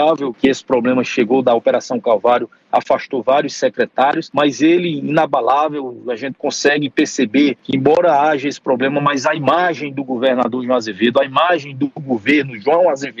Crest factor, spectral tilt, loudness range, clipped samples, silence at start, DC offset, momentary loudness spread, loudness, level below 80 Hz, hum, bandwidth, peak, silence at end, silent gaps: 14 dB; -5 dB/octave; 1 LU; under 0.1%; 0 s; under 0.1%; 6 LU; -16 LUFS; -60 dBFS; none; 7.8 kHz; -2 dBFS; 0.1 s; none